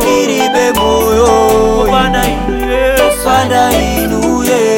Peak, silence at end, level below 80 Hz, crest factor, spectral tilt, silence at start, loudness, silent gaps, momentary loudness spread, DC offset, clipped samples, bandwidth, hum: 0 dBFS; 0 s; -24 dBFS; 10 dB; -4 dB/octave; 0 s; -10 LUFS; none; 4 LU; under 0.1%; under 0.1%; 18.5 kHz; none